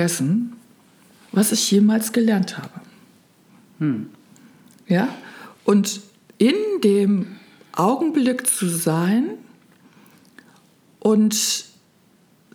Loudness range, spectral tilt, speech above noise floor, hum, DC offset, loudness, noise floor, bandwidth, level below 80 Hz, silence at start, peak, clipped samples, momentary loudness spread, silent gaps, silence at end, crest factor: 5 LU; -4.5 dB/octave; 38 dB; none; under 0.1%; -20 LUFS; -57 dBFS; over 20 kHz; -76 dBFS; 0 s; -4 dBFS; under 0.1%; 15 LU; none; 0.9 s; 18 dB